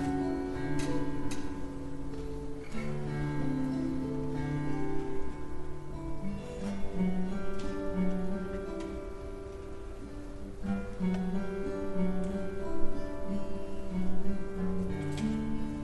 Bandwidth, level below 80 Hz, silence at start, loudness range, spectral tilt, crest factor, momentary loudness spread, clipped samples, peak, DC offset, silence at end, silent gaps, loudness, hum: 11.5 kHz; -42 dBFS; 0 s; 3 LU; -7.5 dB/octave; 16 dB; 10 LU; under 0.1%; -14 dBFS; under 0.1%; 0 s; none; -36 LUFS; none